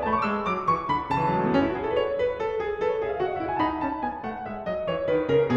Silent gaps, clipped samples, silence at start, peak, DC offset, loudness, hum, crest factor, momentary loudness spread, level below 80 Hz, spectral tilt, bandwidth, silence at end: none; under 0.1%; 0 s; -10 dBFS; 0.1%; -26 LUFS; none; 16 dB; 7 LU; -50 dBFS; -7.5 dB/octave; 8 kHz; 0 s